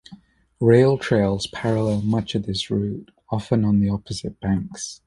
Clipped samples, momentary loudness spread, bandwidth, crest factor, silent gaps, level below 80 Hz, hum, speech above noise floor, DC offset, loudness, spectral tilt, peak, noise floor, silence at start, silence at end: under 0.1%; 13 LU; 11.5 kHz; 18 dB; none; -46 dBFS; none; 27 dB; under 0.1%; -22 LUFS; -6.5 dB/octave; -4 dBFS; -48 dBFS; 0.1 s; 0.1 s